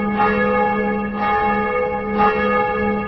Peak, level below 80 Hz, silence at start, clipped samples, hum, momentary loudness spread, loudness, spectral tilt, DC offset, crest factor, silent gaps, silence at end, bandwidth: -4 dBFS; -40 dBFS; 0 s; under 0.1%; none; 4 LU; -18 LUFS; -8.5 dB/octave; under 0.1%; 14 dB; none; 0 s; 5.8 kHz